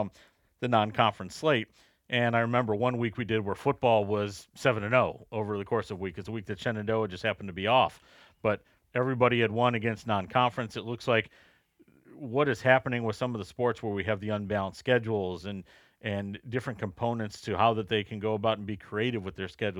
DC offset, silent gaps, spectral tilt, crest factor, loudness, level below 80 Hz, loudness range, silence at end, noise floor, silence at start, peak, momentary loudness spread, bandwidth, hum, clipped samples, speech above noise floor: under 0.1%; none; -6.5 dB/octave; 22 dB; -29 LUFS; -64 dBFS; 4 LU; 0 s; -63 dBFS; 0 s; -8 dBFS; 11 LU; 13 kHz; none; under 0.1%; 34 dB